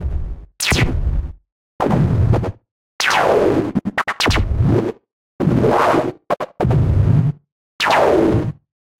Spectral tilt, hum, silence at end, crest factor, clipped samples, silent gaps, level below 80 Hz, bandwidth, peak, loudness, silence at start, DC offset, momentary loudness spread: -6 dB/octave; none; 0.45 s; 14 dB; under 0.1%; 1.52-1.79 s, 2.71-2.99 s, 5.13-5.39 s, 7.52-7.79 s; -28 dBFS; 16.5 kHz; -2 dBFS; -17 LUFS; 0 s; under 0.1%; 12 LU